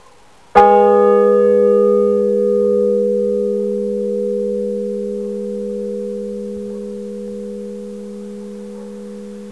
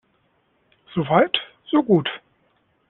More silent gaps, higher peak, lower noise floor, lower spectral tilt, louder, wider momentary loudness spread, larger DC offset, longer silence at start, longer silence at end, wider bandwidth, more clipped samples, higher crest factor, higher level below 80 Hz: neither; about the same, 0 dBFS vs -2 dBFS; second, -48 dBFS vs -65 dBFS; first, -8 dB/octave vs -4 dB/octave; first, -15 LUFS vs -21 LUFS; first, 19 LU vs 12 LU; first, 0.4% vs under 0.1%; second, 0.55 s vs 0.95 s; second, 0 s vs 0.7 s; first, 11 kHz vs 4.2 kHz; neither; about the same, 16 dB vs 20 dB; first, -56 dBFS vs -62 dBFS